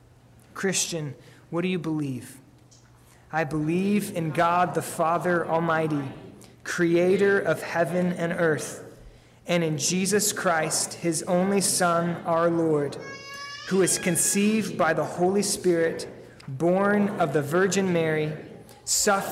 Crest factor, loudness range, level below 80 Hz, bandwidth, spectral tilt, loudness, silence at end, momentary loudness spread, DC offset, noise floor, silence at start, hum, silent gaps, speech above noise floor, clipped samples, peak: 12 dB; 4 LU; -62 dBFS; 16 kHz; -4 dB/octave; -24 LUFS; 0 s; 15 LU; under 0.1%; -54 dBFS; 0.55 s; none; none; 30 dB; under 0.1%; -12 dBFS